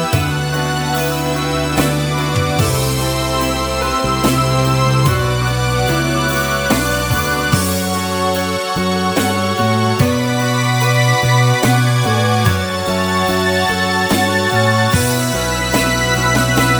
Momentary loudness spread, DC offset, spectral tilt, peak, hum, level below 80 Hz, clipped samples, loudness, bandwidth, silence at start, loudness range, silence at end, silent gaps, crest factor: 4 LU; under 0.1%; -4.5 dB/octave; 0 dBFS; none; -32 dBFS; under 0.1%; -15 LUFS; over 20 kHz; 0 s; 2 LU; 0 s; none; 14 dB